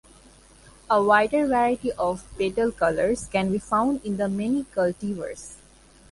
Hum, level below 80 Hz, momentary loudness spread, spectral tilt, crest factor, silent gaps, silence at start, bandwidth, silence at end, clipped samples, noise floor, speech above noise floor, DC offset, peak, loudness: none; -50 dBFS; 12 LU; -5.5 dB/octave; 20 dB; none; 0.9 s; 11.5 kHz; 0.55 s; under 0.1%; -53 dBFS; 29 dB; under 0.1%; -6 dBFS; -24 LUFS